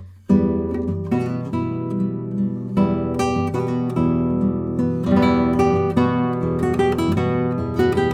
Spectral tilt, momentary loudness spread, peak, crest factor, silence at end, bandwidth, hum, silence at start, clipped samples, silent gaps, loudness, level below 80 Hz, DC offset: -8 dB/octave; 7 LU; -4 dBFS; 16 dB; 0 s; 13.5 kHz; none; 0 s; under 0.1%; none; -20 LUFS; -40 dBFS; under 0.1%